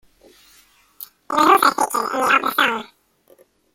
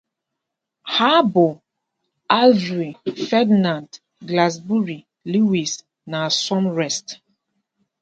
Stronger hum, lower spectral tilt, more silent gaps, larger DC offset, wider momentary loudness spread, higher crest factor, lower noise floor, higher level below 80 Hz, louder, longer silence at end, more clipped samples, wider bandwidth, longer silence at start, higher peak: neither; second, -1.5 dB/octave vs -4.5 dB/octave; neither; neither; first, 25 LU vs 14 LU; about the same, 20 dB vs 20 dB; second, -56 dBFS vs -81 dBFS; about the same, -64 dBFS vs -68 dBFS; about the same, -17 LUFS vs -19 LUFS; about the same, 0.9 s vs 0.9 s; neither; first, 16.5 kHz vs 9 kHz; first, 1 s vs 0.85 s; about the same, 0 dBFS vs 0 dBFS